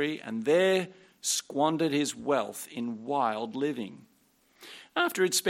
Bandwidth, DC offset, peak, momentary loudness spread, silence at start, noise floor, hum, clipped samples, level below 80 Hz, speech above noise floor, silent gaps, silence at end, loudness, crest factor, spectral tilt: 16.5 kHz; under 0.1%; -12 dBFS; 12 LU; 0 s; -66 dBFS; none; under 0.1%; -78 dBFS; 38 dB; none; 0 s; -29 LUFS; 18 dB; -3.5 dB/octave